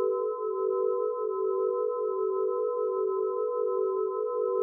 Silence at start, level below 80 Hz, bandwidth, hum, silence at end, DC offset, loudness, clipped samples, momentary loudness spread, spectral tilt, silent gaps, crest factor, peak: 0 s; under -90 dBFS; 1.4 kHz; none; 0 s; under 0.1%; -29 LUFS; under 0.1%; 2 LU; 13 dB/octave; none; 10 dB; -18 dBFS